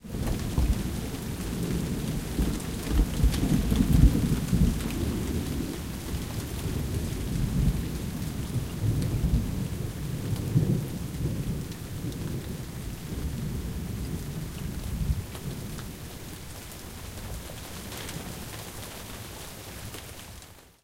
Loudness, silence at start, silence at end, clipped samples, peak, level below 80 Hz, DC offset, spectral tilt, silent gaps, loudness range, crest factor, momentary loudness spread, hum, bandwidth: -31 LUFS; 0.05 s; 0.15 s; under 0.1%; -8 dBFS; -34 dBFS; under 0.1%; -6 dB/octave; none; 12 LU; 22 dB; 14 LU; none; 17 kHz